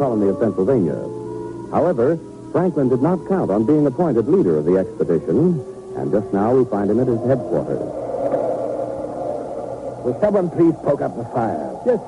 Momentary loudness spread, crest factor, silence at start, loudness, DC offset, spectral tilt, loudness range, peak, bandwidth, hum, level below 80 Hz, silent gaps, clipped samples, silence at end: 10 LU; 12 dB; 0 s; -19 LUFS; under 0.1%; -9.5 dB/octave; 4 LU; -6 dBFS; 11 kHz; none; -50 dBFS; none; under 0.1%; 0 s